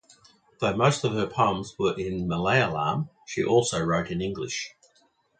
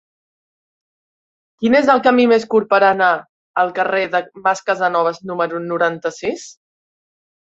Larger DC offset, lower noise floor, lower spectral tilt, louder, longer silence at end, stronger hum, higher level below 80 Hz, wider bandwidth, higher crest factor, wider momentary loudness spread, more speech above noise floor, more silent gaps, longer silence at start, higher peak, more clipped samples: neither; second, -65 dBFS vs under -90 dBFS; about the same, -5 dB/octave vs -5 dB/octave; second, -26 LUFS vs -16 LUFS; second, 0.7 s vs 1.05 s; neither; first, -52 dBFS vs -64 dBFS; first, 9.4 kHz vs 8 kHz; about the same, 20 dB vs 16 dB; about the same, 9 LU vs 11 LU; second, 40 dB vs over 74 dB; second, none vs 3.29-3.54 s; second, 0.6 s vs 1.6 s; second, -6 dBFS vs -2 dBFS; neither